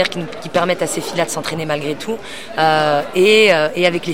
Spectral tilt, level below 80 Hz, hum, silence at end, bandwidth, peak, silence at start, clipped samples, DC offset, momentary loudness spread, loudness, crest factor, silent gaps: -4 dB/octave; -54 dBFS; none; 0 s; 16.5 kHz; 0 dBFS; 0 s; under 0.1%; 2%; 14 LU; -16 LUFS; 16 dB; none